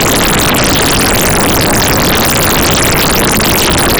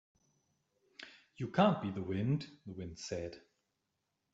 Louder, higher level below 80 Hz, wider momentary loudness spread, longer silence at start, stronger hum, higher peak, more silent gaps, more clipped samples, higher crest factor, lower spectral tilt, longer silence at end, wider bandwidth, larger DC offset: first, -8 LUFS vs -36 LUFS; first, -22 dBFS vs -70 dBFS; second, 0 LU vs 22 LU; second, 0 s vs 1 s; neither; first, -6 dBFS vs -14 dBFS; neither; neither; second, 4 dB vs 24 dB; second, -3 dB/octave vs -6.5 dB/octave; second, 0 s vs 0.95 s; first, over 20 kHz vs 8 kHz; neither